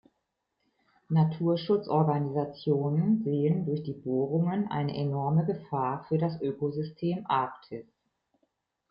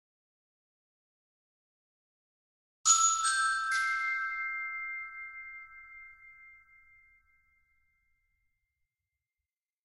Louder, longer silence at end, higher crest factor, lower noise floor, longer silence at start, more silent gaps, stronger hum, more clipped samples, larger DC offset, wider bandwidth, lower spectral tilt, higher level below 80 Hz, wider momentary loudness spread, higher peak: about the same, -29 LUFS vs -29 LUFS; second, 1.1 s vs 3.3 s; second, 16 dB vs 26 dB; second, -81 dBFS vs under -90 dBFS; second, 1.1 s vs 2.85 s; neither; neither; neither; neither; second, 5.4 kHz vs 12 kHz; first, -11.5 dB/octave vs 5.5 dB/octave; about the same, -68 dBFS vs -72 dBFS; second, 6 LU vs 25 LU; about the same, -14 dBFS vs -12 dBFS